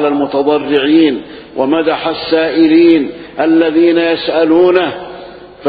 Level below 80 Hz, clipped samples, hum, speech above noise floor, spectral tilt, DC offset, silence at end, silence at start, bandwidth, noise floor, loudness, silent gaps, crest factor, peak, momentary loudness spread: -50 dBFS; under 0.1%; none; 21 dB; -8.5 dB/octave; under 0.1%; 0 s; 0 s; 4.9 kHz; -32 dBFS; -11 LUFS; none; 12 dB; 0 dBFS; 13 LU